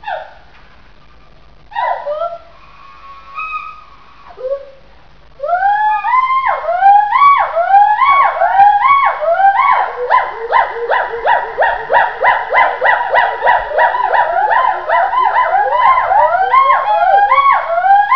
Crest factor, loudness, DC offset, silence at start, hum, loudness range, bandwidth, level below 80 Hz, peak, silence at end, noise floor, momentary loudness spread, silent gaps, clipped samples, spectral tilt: 12 dB; -11 LUFS; 1%; 0 s; none; 14 LU; 5.4 kHz; -48 dBFS; 0 dBFS; 0 s; -44 dBFS; 14 LU; none; under 0.1%; -4 dB/octave